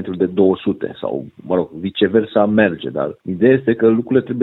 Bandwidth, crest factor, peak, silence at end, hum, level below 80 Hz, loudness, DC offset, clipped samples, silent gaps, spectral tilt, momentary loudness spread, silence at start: 4.1 kHz; 16 dB; 0 dBFS; 0 s; none; -56 dBFS; -17 LUFS; under 0.1%; under 0.1%; none; -10 dB/octave; 10 LU; 0 s